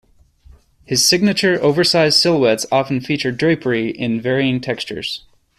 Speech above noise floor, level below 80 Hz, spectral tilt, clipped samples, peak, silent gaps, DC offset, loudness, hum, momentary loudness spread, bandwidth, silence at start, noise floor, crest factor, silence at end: 31 dB; -52 dBFS; -4 dB/octave; under 0.1%; 0 dBFS; none; under 0.1%; -16 LUFS; none; 11 LU; 14.5 kHz; 0.9 s; -48 dBFS; 16 dB; 0.4 s